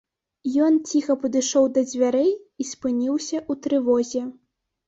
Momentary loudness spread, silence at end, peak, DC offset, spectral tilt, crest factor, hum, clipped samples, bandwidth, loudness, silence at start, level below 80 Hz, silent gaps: 10 LU; 0.55 s; -8 dBFS; under 0.1%; -3.5 dB/octave; 14 dB; none; under 0.1%; 8 kHz; -22 LUFS; 0.45 s; -66 dBFS; none